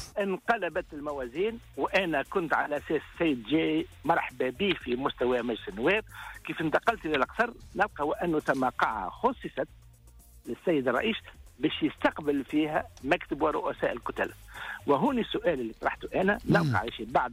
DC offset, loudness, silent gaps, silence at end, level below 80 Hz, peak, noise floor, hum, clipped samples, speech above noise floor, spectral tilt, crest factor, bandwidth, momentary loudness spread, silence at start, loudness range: under 0.1%; -29 LUFS; none; 0 s; -54 dBFS; -14 dBFS; -54 dBFS; none; under 0.1%; 25 dB; -6 dB/octave; 16 dB; 16 kHz; 8 LU; 0 s; 2 LU